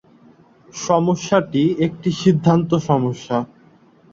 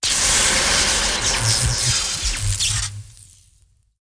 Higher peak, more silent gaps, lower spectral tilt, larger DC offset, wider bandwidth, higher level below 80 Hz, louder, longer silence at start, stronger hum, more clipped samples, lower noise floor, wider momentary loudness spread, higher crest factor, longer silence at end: first, -2 dBFS vs -6 dBFS; neither; first, -6.5 dB/octave vs -1 dB/octave; neither; second, 7.6 kHz vs 10.5 kHz; second, -56 dBFS vs -32 dBFS; about the same, -18 LUFS vs -17 LUFS; first, 0.75 s vs 0 s; neither; neither; second, -51 dBFS vs -58 dBFS; about the same, 8 LU vs 7 LU; about the same, 18 dB vs 16 dB; second, 0.7 s vs 0.95 s